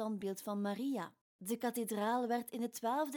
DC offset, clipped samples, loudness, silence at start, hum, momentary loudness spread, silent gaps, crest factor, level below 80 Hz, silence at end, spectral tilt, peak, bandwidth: under 0.1%; under 0.1%; -39 LUFS; 0 s; none; 7 LU; 1.21-1.39 s; 14 dB; -86 dBFS; 0 s; -5 dB/octave; -24 dBFS; 19.5 kHz